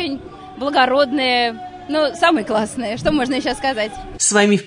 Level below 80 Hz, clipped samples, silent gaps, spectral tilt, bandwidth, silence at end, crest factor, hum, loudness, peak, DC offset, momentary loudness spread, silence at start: -44 dBFS; under 0.1%; none; -3 dB/octave; 11 kHz; 0 s; 16 dB; none; -18 LUFS; -2 dBFS; under 0.1%; 11 LU; 0 s